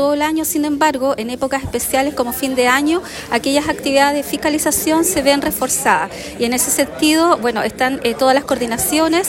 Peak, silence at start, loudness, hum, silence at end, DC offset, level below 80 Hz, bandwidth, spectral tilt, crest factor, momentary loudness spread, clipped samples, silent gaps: -2 dBFS; 0 s; -16 LUFS; none; 0 s; under 0.1%; -44 dBFS; 16.5 kHz; -2.5 dB/octave; 14 dB; 6 LU; under 0.1%; none